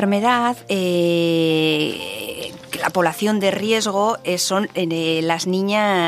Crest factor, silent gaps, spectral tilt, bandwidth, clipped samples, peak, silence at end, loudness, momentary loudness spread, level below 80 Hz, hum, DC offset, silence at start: 16 dB; none; -4.5 dB/octave; 15.5 kHz; under 0.1%; -2 dBFS; 0 s; -19 LUFS; 8 LU; -64 dBFS; none; under 0.1%; 0 s